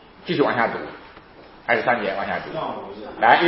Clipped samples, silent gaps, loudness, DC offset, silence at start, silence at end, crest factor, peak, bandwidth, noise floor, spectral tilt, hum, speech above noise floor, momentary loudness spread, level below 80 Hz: under 0.1%; none; -22 LUFS; under 0.1%; 0.2 s; 0 s; 22 dB; 0 dBFS; 5.8 kHz; -45 dBFS; -9.5 dB/octave; none; 24 dB; 15 LU; -56 dBFS